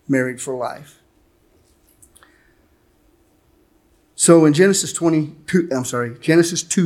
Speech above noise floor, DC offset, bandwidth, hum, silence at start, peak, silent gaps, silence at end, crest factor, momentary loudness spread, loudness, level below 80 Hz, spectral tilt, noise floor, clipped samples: 41 dB; under 0.1%; 15 kHz; none; 0.1 s; 0 dBFS; none; 0 s; 20 dB; 14 LU; -17 LUFS; -62 dBFS; -4.5 dB/octave; -58 dBFS; under 0.1%